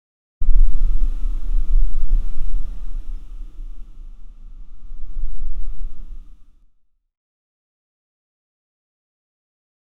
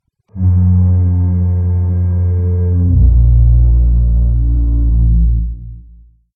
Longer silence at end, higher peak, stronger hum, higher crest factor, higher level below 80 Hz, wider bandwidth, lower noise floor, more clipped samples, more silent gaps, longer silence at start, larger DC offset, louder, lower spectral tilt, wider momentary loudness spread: first, 2.85 s vs 0.55 s; about the same, 0 dBFS vs 0 dBFS; neither; first, 16 dB vs 10 dB; second, -20 dBFS vs -14 dBFS; second, 1.3 kHz vs 1.7 kHz; first, -56 dBFS vs -41 dBFS; neither; neither; about the same, 0.4 s vs 0.35 s; first, 2% vs under 0.1%; second, -28 LUFS vs -13 LUFS; second, -8 dB/octave vs -14 dB/octave; first, 22 LU vs 6 LU